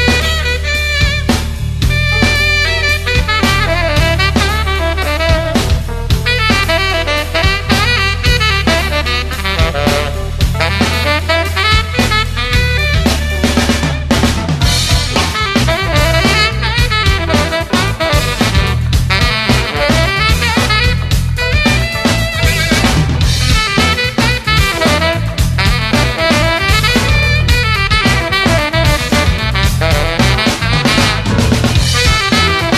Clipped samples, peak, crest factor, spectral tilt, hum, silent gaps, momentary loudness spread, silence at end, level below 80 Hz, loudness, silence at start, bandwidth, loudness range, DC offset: under 0.1%; 0 dBFS; 12 dB; -4.5 dB/octave; none; none; 4 LU; 0 s; -18 dBFS; -12 LUFS; 0 s; 14.5 kHz; 2 LU; under 0.1%